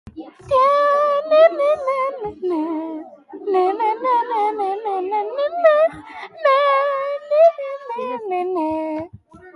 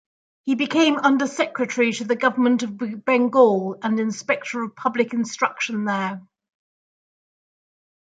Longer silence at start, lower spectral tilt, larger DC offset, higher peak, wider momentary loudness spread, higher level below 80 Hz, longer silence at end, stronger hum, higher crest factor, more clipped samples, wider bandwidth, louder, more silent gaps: second, 0.05 s vs 0.45 s; about the same, -5.5 dB/octave vs -4.5 dB/octave; neither; about the same, -4 dBFS vs -2 dBFS; first, 15 LU vs 9 LU; first, -58 dBFS vs -74 dBFS; second, 0.05 s vs 1.8 s; neither; about the same, 16 dB vs 20 dB; neither; first, 11 kHz vs 9.2 kHz; first, -18 LUFS vs -21 LUFS; neither